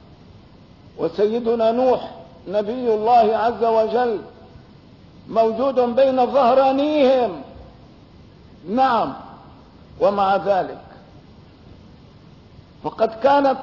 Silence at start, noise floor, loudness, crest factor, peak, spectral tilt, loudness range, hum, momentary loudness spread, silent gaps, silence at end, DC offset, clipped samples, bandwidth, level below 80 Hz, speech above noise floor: 0.95 s; -46 dBFS; -19 LUFS; 14 dB; -6 dBFS; -7 dB/octave; 6 LU; none; 16 LU; none; 0 s; under 0.1%; under 0.1%; 6 kHz; -54 dBFS; 28 dB